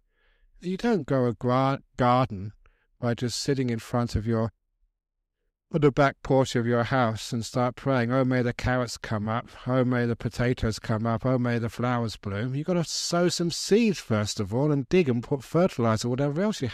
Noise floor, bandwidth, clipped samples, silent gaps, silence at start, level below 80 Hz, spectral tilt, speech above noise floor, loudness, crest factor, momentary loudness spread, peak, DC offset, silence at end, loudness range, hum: -79 dBFS; 14.5 kHz; under 0.1%; none; 0.6 s; -48 dBFS; -6 dB/octave; 54 dB; -26 LUFS; 18 dB; 7 LU; -8 dBFS; under 0.1%; 0 s; 3 LU; none